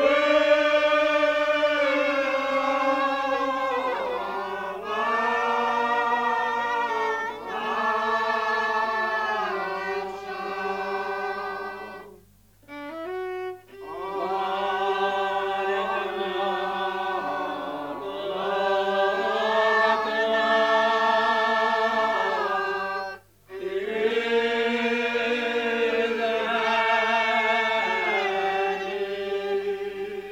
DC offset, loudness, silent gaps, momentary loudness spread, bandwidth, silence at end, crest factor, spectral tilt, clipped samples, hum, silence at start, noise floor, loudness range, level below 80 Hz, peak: under 0.1%; -24 LUFS; none; 11 LU; 16.5 kHz; 0 s; 16 dB; -3.5 dB/octave; under 0.1%; 50 Hz at -65 dBFS; 0 s; -56 dBFS; 8 LU; -64 dBFS; -8 dBFS